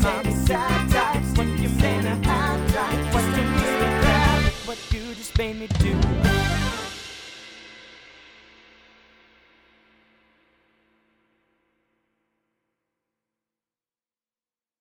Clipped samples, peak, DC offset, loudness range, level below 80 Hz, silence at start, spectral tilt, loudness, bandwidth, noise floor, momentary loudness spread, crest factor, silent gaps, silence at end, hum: under 0.1%; -4 dBFS; under 0.1%; 12 LU; -30 dBFS; 0 s; -5.5 dB/octave; -22 LUFS; over 20 kHz; under -90 dBFS; 17 LU; 20 dB; none; 6.9 s; none